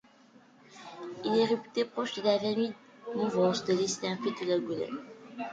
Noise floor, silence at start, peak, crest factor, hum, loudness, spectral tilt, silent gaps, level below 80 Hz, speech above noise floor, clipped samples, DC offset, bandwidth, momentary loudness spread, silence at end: -59 dBFS; 0.7 s; -14 dBFS; 16 dB; none; -31 LUFS; -4.5 dB/octave; none; -74 dBFS; 29 dB; under 0.1%; under 0.1%; 9.4 kHz; 16 LU; 0 s